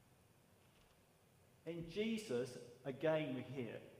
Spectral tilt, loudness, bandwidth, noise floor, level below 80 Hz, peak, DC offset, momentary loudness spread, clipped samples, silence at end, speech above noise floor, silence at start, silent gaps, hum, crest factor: -6 dB/octave; -44 LUFS; 15.5 kHz; -71 dBFS; -76 dBFS; -24 dBFS; under 0.1%; 12 LU; under 0.1%; 0 s; 28 dB; 1.65 s; none; none; 22 dB